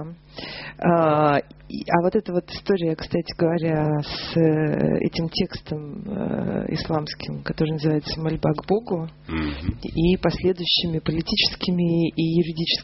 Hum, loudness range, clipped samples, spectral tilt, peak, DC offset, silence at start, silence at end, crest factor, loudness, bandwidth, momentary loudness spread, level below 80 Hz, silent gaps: none; 4 LU; under 0.1%; -5 dB/octave; 0 dBFS; under 0.1%; 0 s; 0 s; 22 dB; -23 LUFS; 6 kHz; 11 LU; -42 dBFS; none